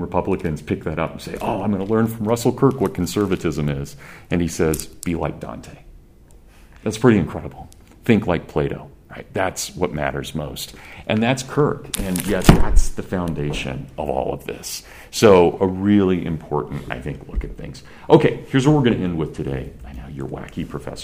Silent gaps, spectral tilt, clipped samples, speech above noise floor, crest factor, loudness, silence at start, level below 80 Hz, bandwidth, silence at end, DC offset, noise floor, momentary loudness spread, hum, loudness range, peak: none; -6 dB/octave; under 0.1%; 27 dB; 20 dB; -21 LUFS; 0 s; -30 dBFS; 15.5 kHz; 0 s; under 0.1%; -46 dBFS; 16 LU; none; 5 LU; 0 dBFS